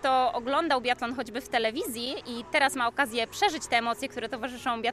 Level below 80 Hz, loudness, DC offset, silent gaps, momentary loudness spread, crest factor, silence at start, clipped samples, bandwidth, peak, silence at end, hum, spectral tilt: -60 dBFS; -28 LUFS; under 0.1%; none; 9 LU; 18 dB; 0 s; under 0.1%; 14.5 kHz; -10 dBFS; 0 s; none; -2.5 dB/octave